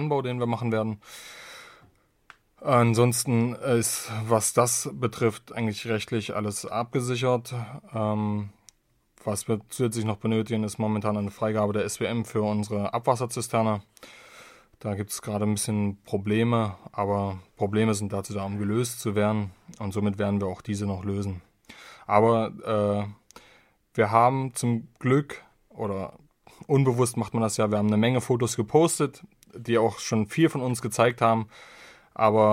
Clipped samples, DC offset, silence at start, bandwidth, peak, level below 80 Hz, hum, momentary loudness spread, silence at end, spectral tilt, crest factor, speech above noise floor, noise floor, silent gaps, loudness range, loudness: under 0.1%; under 0.1%; 0 s; 16 kHz; -4 dBFS; -64 dBFS; none; 13 LU; 0 s; -5.5 dB/octave; 22 dB; 39 dB; -65 dBFS; none; 5 LU; -26 LUFS